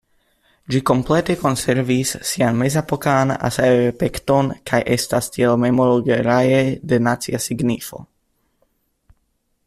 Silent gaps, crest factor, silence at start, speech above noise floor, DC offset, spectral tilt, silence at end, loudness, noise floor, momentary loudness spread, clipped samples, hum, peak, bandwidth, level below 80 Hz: none; 16 dB; 0.7 s; 50 dB; under 0.1%; -5.5 dB/octave; 1.6 s; -18 LUFS; -67 dBFS; 6 LU; under 0.1%; none; -2 dBFS; 15 kHz; -46 dBFS